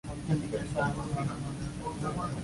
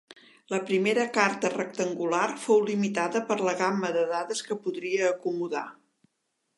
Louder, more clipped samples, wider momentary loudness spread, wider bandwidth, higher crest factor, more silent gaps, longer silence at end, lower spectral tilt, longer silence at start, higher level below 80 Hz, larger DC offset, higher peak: second, -34 LUFS vs -27 LUFS; neither; about the same, 6 LU vs 8 LU; about the same, 11.5 kHz vs 11.5 kHz; second, 16 dB vs 22 dB; neither; second, 0 s vs 0.85 s; first, -6.5 dB/octave vs -4.5 dB/octave; about the same, 0.05 s vs 0.1 s; first, -48 dBFS vs -82 dBFS; neither; second, -18 dBFS vs -6 dBFS